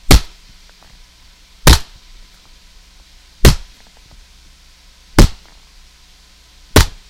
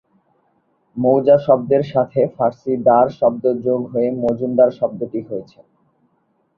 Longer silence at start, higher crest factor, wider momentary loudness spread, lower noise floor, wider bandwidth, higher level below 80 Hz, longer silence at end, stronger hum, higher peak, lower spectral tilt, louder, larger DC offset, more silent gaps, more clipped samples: second, 0.1 s vs 0.95 s; about the same, 16 dB vs 16 dB; second, 6 LU vs 12 LU; second, -46 dBFS vs -64 dBFS; first, 17 kHz vs 6 kHz; first, -20 dBFS vs -58 dBFS; second, 0.25 s vs 1.15 s; neither; about the same, 0 dBFS vs -2 dBFS; second, -4 dB/octave vs -10 dB/octave; first, -14 LUFS vs -17 LUFS; neither; neither; first, 0.2% vs under 0.1%